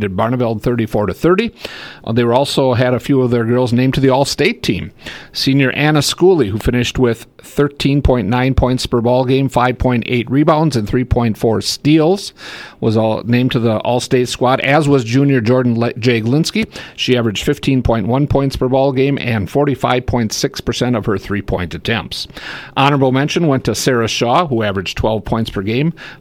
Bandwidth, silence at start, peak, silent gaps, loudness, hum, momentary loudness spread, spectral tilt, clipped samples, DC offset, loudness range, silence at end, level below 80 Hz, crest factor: 16.5 kHz; 0 s; 0 dBFS; none; -15 LUFS; none; 7 LU; -6 dB/octave; under 0.1%; under 0.1%; 2 LU; 0.05 s; -32 dBFS; 14 dB